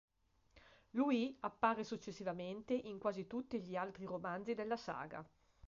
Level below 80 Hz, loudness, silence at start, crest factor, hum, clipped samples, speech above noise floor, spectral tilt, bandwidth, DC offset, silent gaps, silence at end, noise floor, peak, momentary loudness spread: -74 dBFS; -42 LUFS; 0.55 s; 22 dB; none; under 0.1%; 31 dB; -4.5 dB/octave; 7.4 kHz; under 0.1%; none; 0 s; -72 dBFS; -20 dBFS; 9 LU